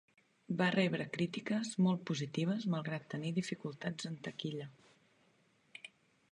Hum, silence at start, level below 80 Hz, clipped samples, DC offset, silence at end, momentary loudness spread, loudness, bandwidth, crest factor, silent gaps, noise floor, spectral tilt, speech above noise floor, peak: none; 0.5 s; -80 dBFS; under 0.1%; under 0.1%; 0.45 s; 19 LU; -37 LUFS; 10.5 kHz; 20 dB; none; -72 dBFS; -6 dB/octave; 36 dB; -18 dBFS